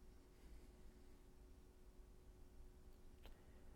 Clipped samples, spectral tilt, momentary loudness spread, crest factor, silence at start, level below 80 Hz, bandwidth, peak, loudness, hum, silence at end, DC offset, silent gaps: under 0.1%; -5.5 dB/octave; 3 LU; 18 dB; 0 s; -64 dBFS; 17.5 kHz; -44 dBFS; -67 LUFS; none; 0 s; under 0.1%; none